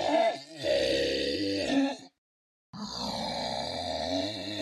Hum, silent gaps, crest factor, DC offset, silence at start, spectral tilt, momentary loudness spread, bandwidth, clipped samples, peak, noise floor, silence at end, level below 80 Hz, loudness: none; 2.18-2.73 s; 16 dB; under 0.1%; 0 s; -4 dB/octave; 9 LU; 13.5 kHz; under 0.1%; -14 dBFS; under -90 dBFS; 0 s; -58 dBFS; -30 LUFS